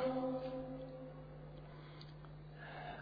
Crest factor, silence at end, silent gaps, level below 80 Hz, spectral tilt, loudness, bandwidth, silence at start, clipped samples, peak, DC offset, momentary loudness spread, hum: 18 dB; 0 s; none; -64 dBFS; -6 dB/octave; -48 LUFS; 5 kHz; 0 s; under 0.1%; -28 dBFS; under 0.1%; 13 LU; none